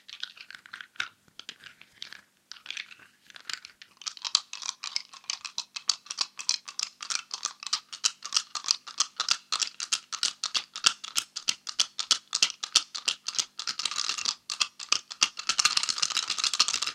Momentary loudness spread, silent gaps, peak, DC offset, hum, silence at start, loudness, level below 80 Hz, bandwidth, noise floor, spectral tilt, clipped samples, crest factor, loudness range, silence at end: 18 LU; none; 0 dBFS; under 0.1%; none; 0.1 s; -28 LUFS; -82 dBFS; 16.5 kHz; -53 dBFS; 3.5 dB/octave; under 0.1%; 32 dB; 9 LU; 0 s